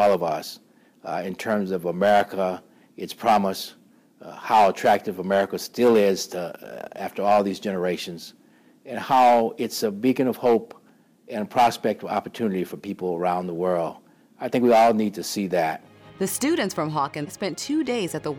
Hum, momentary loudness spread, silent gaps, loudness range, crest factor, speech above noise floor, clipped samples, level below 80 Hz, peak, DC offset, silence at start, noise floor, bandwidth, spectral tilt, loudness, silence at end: none; 16 LU; none; 3 LU; 14 dB; 32 dB; under 0.1%; -66 dBFS; -10 dBFS; under 0.1%; 0 s; -55 dBFS; 16 kHz; -5 dB/octave; -23 LUFS; 0 s